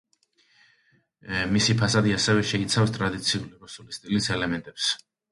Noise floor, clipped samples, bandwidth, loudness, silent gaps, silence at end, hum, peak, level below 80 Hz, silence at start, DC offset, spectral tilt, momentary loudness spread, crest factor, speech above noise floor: -66 dBFS; under 0.1%; 11.5 kHz; -24 LUFS; none; 0.35 s; none; -8 dBFS; -52 dBFS; 1.25 s; under 0.1%; -4 dB/octave; 12 LU; 18 dB; 41 dB